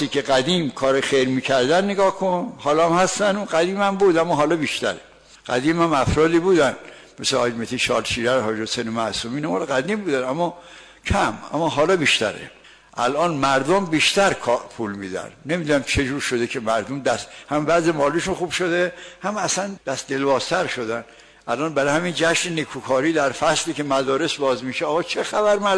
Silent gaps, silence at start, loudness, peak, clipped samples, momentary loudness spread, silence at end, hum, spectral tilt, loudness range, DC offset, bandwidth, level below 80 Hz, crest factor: none; 0 s; -21 LUFS; -6 dBFS; under 0.1%; 9 LU; 0 s; none; -4 dB/octave; 4 LU; under 0.1%; 11 kHz; -46 dBFS; 14 dB